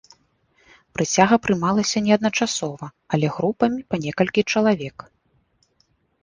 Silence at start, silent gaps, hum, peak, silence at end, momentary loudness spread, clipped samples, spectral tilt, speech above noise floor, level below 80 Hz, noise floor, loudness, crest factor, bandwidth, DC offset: 1 s; none; none; -2 dBFS; 1.3 s; 9 LU; under 0.1%; -4.5 dB/octave; 45 dB; -56 dBFS; -65 dBFS; -21 LUFS; 20 dB; 10 kHz; under 0.1%